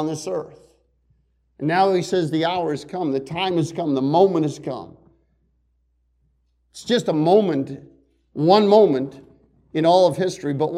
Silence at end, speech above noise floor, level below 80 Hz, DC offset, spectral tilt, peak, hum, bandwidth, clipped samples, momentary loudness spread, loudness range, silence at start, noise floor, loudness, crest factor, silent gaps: 0 s; 47 dB; -62 dBFS; under 0.1%; -6 dB/octave; -2 dBFS; none; 12.5 kHz; under 0.1%; 16 LU; 5 LU; 0 s; -66 dBFS; -20 LUFS; 18 dB; none